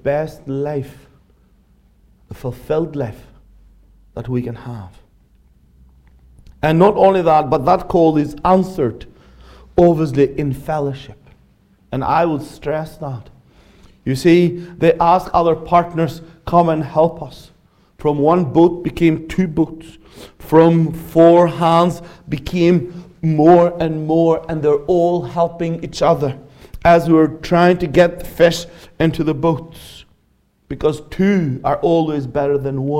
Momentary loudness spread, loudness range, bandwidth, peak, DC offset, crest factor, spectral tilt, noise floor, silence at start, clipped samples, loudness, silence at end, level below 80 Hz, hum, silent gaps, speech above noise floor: 16 LU; 12 LU; 15.5 kHz; 0 dBFS; under 0.1%; 16 dB; -7.5 dB/octave; -59 dBFS; 0.05 s; under 0.1%; -16 LUFS; 0 s; -42 dBFS; none; none; 44 dB